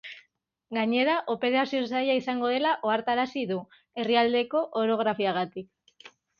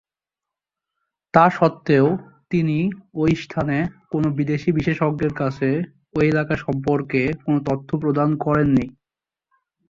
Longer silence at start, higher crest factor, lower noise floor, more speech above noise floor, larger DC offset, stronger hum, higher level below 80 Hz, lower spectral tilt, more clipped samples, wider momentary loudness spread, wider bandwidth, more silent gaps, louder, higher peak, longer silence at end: second, 0.05 s vs 1.35 s; about the same, 18 dB vs 20 dB; second, -68 dBFS vs -89 dBFS; second, 42 dB vs 69 dB; neither; neither; second, -72 dBFS vs -50 dBFS; second, -6 dB/octave vs -8.5 dB/octave; neither; first, 10 LU vs 7 LU; about the same, 7 kHz vs 7.4 kHz; neither; second, -27 LUFS vs -21 LUFS; second, -8 dBFS vs -2 dBFS; second, 0.3 s vs 1 s